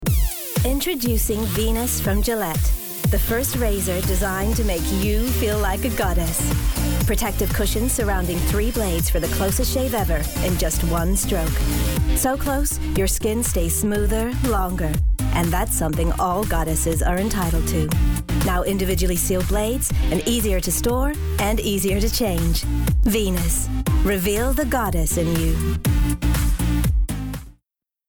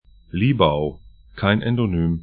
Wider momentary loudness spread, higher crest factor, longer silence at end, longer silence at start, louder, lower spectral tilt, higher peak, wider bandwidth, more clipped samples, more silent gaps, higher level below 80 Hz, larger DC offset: second, 2 LU vs 9 LU; second, 10 dB vs 20 dB; first, 0.6 s vs 0 s; second, 0 s vs 0.35 s; about the same, -21 LUFS vs -20 LUFS; second, -5 dB/octave vs -12 dB/octave; second, -10 dBFS vs 0 dBFS; first, over 20 kHz vs 4.7 kHz; neither; neither; first, -24 dBFS vs -40 dBFS; first, 0.1% vs under 0.1%